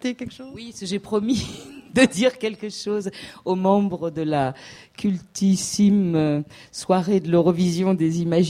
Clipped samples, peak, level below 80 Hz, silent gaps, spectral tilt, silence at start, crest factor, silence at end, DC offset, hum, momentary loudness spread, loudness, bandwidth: under 0.1%; -2 dBFS; -56 dBFS; none; -6 dB/octave; 0 s; 18 dB; 0 s; under 0.1%; none; 15 LU; -22 LUFS; 14 kHz